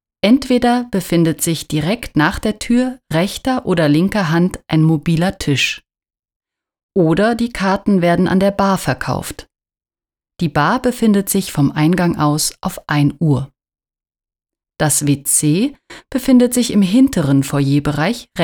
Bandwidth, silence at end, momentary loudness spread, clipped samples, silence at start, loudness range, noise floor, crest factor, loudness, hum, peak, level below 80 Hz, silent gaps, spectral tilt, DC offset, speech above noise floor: 20 kHz; 0 s; 7 LU; under 0.1%; 0.25 s; 3 LU; under -90 dBFS; 14 dB; -15 LUFS; none; -2 dBFS; -42 dBFS; 6.19-6.23 s, 6.36-6.40 s, 6.83-6.89 s; -5 dB/octave; under 0.1%; over 75 dB